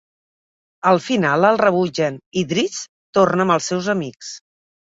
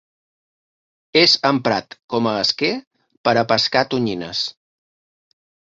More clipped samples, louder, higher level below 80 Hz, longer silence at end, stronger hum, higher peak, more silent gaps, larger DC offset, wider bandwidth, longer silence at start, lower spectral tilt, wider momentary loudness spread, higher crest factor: neither; about the same, -18 LUFS vs -18 LUFS; about the same, -60 dBFS vs -60 dBFS; second, 0.45 s vs 1.25 s; neither; about the same, -2 dBFS vs -2 dBFS; first, 2.26-2.32 s, 2.89-3.13 s vs 2.04-2.08 s, 2.87-2.91 s, 3.17-3.24 s; neither; about the same, 7.8 kHz vs 7.8 kHz; second, 0.85 s vs 1.15 s; about the same, -5 dB/octave vs -4 dB/octave; first, 15 LU vs 11 LU; about the same, 18 dB vs 20 dB